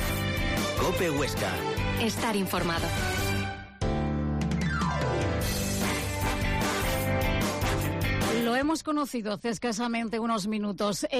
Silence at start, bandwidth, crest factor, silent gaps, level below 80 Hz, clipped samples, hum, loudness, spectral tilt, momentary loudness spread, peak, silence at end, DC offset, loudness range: 0 s; 15.5 kHz; 12 dB; none; -38 dBFS; under 0.1%; none; -28 LUFS; -5 dB/octave; 3 LU; -16 dBFS; 0 s; under 0.1%; 1 LU